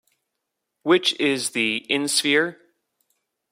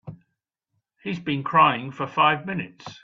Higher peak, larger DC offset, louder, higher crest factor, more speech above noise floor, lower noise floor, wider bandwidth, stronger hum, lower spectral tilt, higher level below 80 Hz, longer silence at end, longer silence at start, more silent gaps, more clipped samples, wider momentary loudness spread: about the same, -4 dBFS vs -4 dBFS; neither; about the same, -21 LUFS vs -22 LUFS; about the same, 20 dB vs 22 dB; about the same, 59 dB vs 57 dB; about the same, -80 dBFS vs -80 dBFS; first, 16 kHz vs 7.4 kHz; neither; second, -2 dB/octave vs -6.5 dB/octave; second, -72 dBFS vs -64 dBFS; first, 0.95 s vs 0.1 s; first, 0.85 s vs 0.05 s; neither; neither; second, 5 LU vs 15 LU